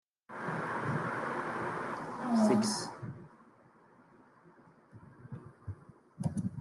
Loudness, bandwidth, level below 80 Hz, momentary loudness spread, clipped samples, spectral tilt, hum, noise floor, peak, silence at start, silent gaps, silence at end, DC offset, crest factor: -34 LUFS; 12 kHz; -72 dBFS; 22 LU; under 0.1%; -5.5 dB/octave; none; -62 dBFS; -16 dBFS; 0.3 s; none; 0 s; under 0.1%; 20 dB